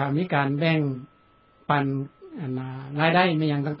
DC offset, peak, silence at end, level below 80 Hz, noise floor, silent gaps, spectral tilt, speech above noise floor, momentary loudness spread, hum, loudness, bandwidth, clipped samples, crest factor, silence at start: under 0.1%; -6 dBFS; 0 s; -64 dBFS; -59 dBFS; none; -11 dB/octave; 35 dB; 16 LU; none; -24 LUFS; 5.6 kHz; under 0.1%; 20 dB; 0 s